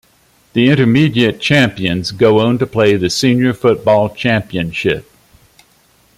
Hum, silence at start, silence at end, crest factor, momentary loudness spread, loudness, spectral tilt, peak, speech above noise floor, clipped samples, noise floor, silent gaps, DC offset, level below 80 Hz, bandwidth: none; 0.55 s; 1.15 s; 12 dB; 7 LU; -13 LUFS; -6 dB/octave; -2 dBFS; 40 dB; under 0.1%; -52 dBFS; none; under 0.1%; -46 dBFS; 15 kHz